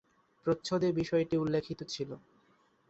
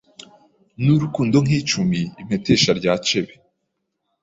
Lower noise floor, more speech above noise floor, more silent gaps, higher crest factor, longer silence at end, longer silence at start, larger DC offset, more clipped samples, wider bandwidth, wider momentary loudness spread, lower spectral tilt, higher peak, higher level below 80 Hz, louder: second, -69 dBFS vs -75 dBFS; second, 37 dB vs 57 dB; neither; about the same, 16 dB vs 18 dB; second, 0.7 s vs 0.95 s; second, 0.45 s vs 0.8 s; neither; neither; about the same, 8.2 kHz vs 8 kHz; about the same, 10 LU vs 9 LU; first, -6.5 dB/octave vs -5 dB/octave; second, -18 dBFS vs -2 dBFS; second, -64 dBFS vs -50 dBFS; second, -33 LUFS vs -19 LUFS